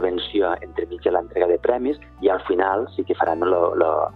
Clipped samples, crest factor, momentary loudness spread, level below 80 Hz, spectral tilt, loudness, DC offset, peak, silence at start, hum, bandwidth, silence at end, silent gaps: under 0.1%; 18 dB; 6 LU; -48 dBFS; -8 dB/octave; -22 LUFS; under 0.1%; -4 dBFS; 0 s; none; 4.6 kHz; 0 s; none